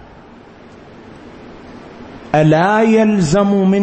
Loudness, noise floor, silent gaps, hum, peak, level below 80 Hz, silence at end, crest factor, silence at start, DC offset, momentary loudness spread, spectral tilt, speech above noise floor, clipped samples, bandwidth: -13 LUFS; -39 dBFS; none; none; -2 dBFS; -44 dBFS; 0 s; 14 dB; 1.1 s; under 0.1%; 24 LU; -7 dB/octave; 28 dB; under 0.1%; 8.8 kHz